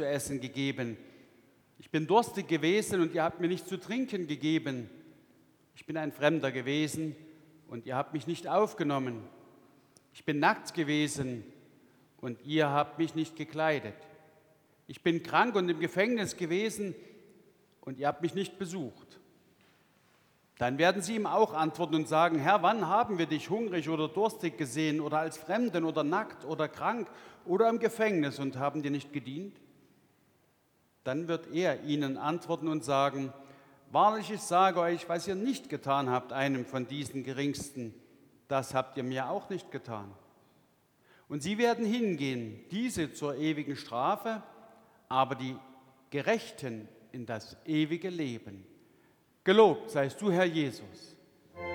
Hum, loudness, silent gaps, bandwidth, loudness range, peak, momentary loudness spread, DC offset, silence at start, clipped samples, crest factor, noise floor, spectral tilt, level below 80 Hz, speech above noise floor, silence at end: none; -31 LUFS; none; 19.5 kHz; 7 LU; -10 dBFS; 14 LU; under 0.1%; 0 s; under 0.1%; 22 dB; -70 dBFS; -5.5 dB/octave; -72 dBFS; 39 dB; 0 s